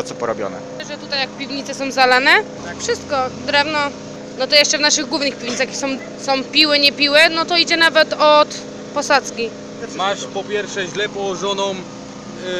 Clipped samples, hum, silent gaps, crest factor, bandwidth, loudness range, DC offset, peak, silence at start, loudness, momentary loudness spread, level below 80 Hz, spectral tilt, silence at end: under 0.1%; 60 Hz at -50 dBFS; none; 18 dB; 15.5 kHz; 7 LU; under 0.1%; 0 dBFS; 0 s; -16 LUFS; 17 LU; -56 dBFS; -2 dB/octave; 0 s